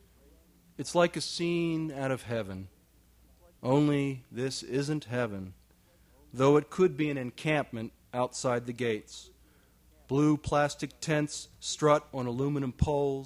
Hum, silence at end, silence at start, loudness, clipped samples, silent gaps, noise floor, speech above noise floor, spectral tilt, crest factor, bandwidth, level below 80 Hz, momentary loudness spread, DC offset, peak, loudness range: none; 0 s; 0.8 s; -30 LUFS; under 0.1%; none; -63 dBFS; 33 dB; -5.5 dB/octave; 20 dB; 15 kHz; -54 dBFS; 12 LU; under 0.1%; -10 dBFS; 3 LU